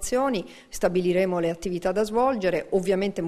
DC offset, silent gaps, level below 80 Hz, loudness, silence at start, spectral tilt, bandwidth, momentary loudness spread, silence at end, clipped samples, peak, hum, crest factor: under 0.1%; none; -48 dBFS; -25 LUFS; 0 s; -5.5 dB/octave; 13.5 kHz; 5 LU; 0 s; under 0.1%; -8 dBFS; none; 16 dB